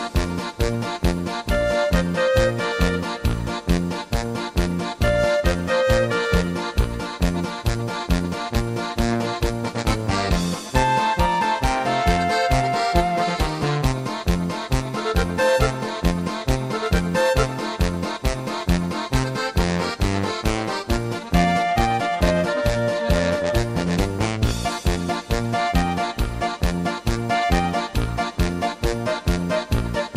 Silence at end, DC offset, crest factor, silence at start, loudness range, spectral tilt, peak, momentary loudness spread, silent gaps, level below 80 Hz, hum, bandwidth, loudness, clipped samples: 0 s; under 0.1%; 18 dB; 0 s; 3 LU; -5.5 dB/octave; -2 dBFS; 5 LU; none; -28 dBFS; none; 16 kHz; -22 LUFS; under 0.1%